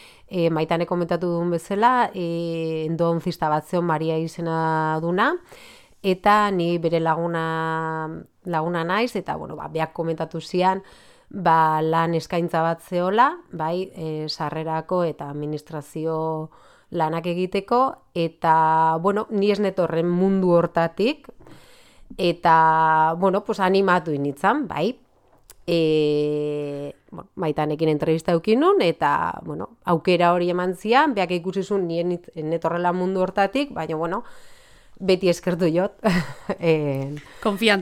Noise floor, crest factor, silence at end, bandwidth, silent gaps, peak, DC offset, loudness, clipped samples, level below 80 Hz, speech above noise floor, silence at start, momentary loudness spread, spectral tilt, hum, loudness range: -52 dBFS; 20 dB; 0 s; 15.5 kHz; none; -2 dBFS; under 0.1%; -22 LUFS; under 0.1%; -56 dBFS; 31 dB; 0.3 s; 11 LU; -6.5 dB/octave; none; 5 LU